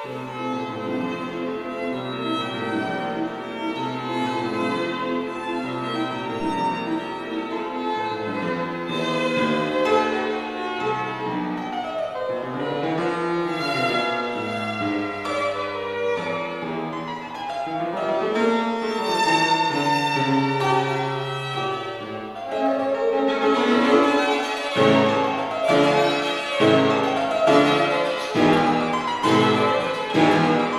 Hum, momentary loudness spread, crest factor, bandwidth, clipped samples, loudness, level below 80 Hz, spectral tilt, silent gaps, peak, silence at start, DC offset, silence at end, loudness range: none; 10 LU; 20 dB; 14.5 kHz; under 0.1%; -23 LUFS; -60 dBFS; -5.5 dB/octave; none; -2 dBFS; 0 s; under 0.1%; 0 s; 7 LU